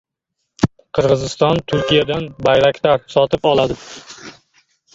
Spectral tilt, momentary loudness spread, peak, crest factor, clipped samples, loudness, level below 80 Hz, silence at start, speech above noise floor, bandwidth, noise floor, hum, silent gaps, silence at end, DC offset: -5.5 dB/octave; 16 LU; 0 dBFS; 16 dB; under 0.1%; -16 LUFS; -44 dBFS; 0.6 s; 59 dB; 7.8 kHz; -75 dBFS; none; none; 0.65 s; under 0.1%